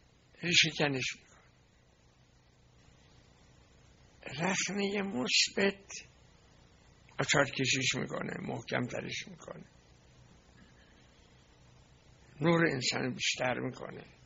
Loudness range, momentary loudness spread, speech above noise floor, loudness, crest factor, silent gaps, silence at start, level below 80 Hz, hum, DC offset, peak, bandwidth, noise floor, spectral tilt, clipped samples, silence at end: 11 LU; 19 LU; 32 dB; -31 LUFS; 26 dB; none; 0.4 s; -66 dBFS; 60 Hz at -65 dBFS; under 0.1%; -8 dBFS; 8 kHz; -65 dBFS; -2.5 dB/octave; under 0.1%; 0.2 s